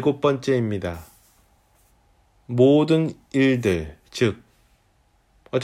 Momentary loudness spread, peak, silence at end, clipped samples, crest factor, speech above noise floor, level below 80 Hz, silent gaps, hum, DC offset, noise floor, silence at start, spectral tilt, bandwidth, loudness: 15 LU; -6 dBFS; 0 s; under 0.1%; 18 dB; 42 dB; -50 dBFS; none; none; under 0.1%; -62 dBFS; 0 s; -7 dB/octave; 15.5 kHz; -21 LUFS